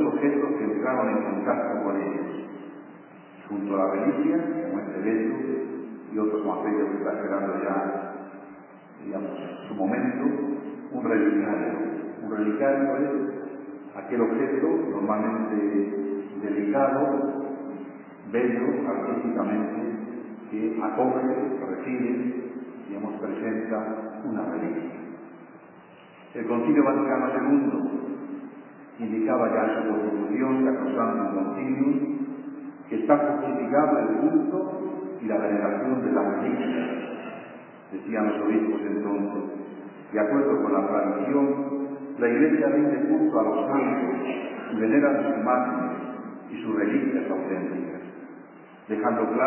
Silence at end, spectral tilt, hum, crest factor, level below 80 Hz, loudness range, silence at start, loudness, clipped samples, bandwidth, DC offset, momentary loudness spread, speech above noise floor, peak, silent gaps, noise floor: 0 s; -11 dB/octave; none; 20 dB; -80 dBFS; 6 LU; 0 s; -26 LUFS; under 0.1%; 3.2 kHz; under 0.1%; 15 LU; 25 dB; -6 dBFS; none; -49 dBFS